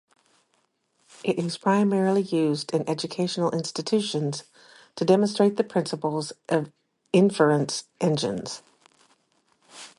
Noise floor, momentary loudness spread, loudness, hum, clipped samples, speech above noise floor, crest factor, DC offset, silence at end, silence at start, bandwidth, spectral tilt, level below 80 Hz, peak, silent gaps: -71 dBFS; 11 LU; -25 LUFS; none; under 0.1%; 47 dB; 20 dB; under 0.1%; 0.1 s; 1.25 s; 11.5 kHz; -5.5 dB/octave; -70 dBFS; -6 dBFS; none